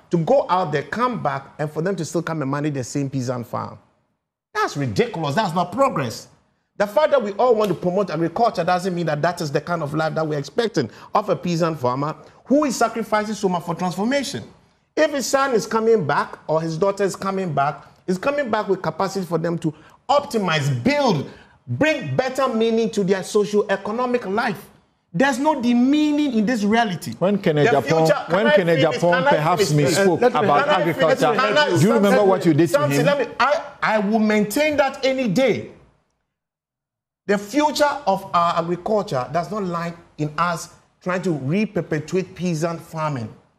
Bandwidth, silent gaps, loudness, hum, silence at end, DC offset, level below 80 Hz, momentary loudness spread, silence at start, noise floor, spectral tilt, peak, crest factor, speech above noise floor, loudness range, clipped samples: 14.5 kHz; none; -20 LUFS; none; 0.25 s; under 0.1%; -58 dBFS; 9 LU; 0.1 s; -87 dBFS; -5.5 dB/octave; -6 dBFS; 14 dB; 67 dB; 7 LU; under 0.1%